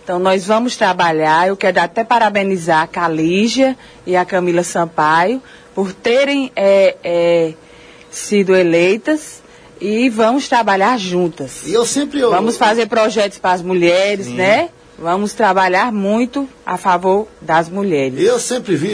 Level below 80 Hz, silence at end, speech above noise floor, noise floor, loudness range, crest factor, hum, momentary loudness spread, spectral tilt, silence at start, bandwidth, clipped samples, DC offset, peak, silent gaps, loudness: -54 dBFS; 0 s; 24 dB; -38 dBFS; 2 LU; 14 dB; none; 8 LU; -4.5 dB/octave; 0.05 s; 11 kHz; under 0.1%; under 0.1%; 0 dBFS; none; -14 LUFS